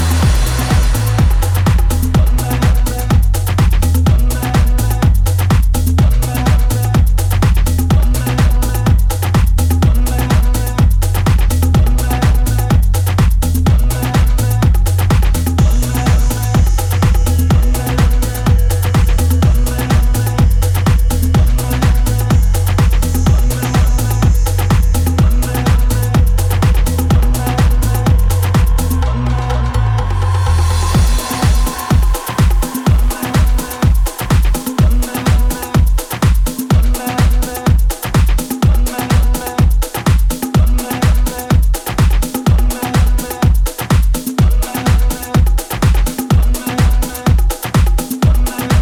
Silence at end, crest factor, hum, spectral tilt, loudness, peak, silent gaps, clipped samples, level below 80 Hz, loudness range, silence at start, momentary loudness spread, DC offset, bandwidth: 0 s; 10 dB; none; -6 dB/octave; -14 LUFS; -2 dBFS; none; under 0.1%; -14 dBFS; 1 LU; 0 s; 2 LU; under 0.1%; 19.5 kHz